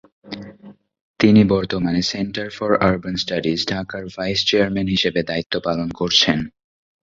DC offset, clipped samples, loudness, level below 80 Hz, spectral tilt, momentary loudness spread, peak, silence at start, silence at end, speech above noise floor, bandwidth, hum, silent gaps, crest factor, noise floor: under 0.1%; under 0.1%; -19 LUFS; -46 dBFS; -5 dB/octave; 12 LU; 0 dBFS; 0.25 s; 0.55 s; 25 dB; 7.6 kHz; none; 1.01-1.14 s, 5.46-5.50 s; 20 dB; -45 dBFS